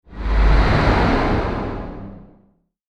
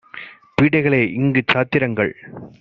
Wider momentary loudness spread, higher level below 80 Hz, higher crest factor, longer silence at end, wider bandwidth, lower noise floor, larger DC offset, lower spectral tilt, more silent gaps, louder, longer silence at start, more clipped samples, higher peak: second, 17 LU vs 20 LU; first, -20 dBFS vs -52 dBFS; about the same, 16 dB vs 18 dB; first, 0.65 s vs 0.1 s; about the same, 6.8 kHz vs 7.2 kHz; first, -59 dBFS vs -38 dBFS; neither; first, -7.5 dB/octave vs -5 dB/octave; neither; about the same, -19 LUFS vs -18 LUFS; about the same, 0.1 s vs 0.15 s; neither; about the same, -2 dBFS vs -2 dBFS